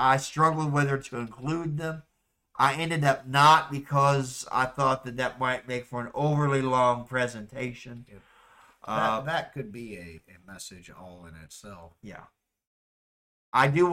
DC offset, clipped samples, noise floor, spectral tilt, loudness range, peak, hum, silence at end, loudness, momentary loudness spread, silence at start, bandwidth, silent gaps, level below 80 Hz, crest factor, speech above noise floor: under 0.1%; under 0.1%; -60 dBFS; -5.5 dB/octave; 19 LU; -10 dBFS; none; 0 s; -26 LUFS; 23 LU; 0 s; 15.5 kHz; 12.67-13.52 s; -60 dBFS; 18 dB; 33 dB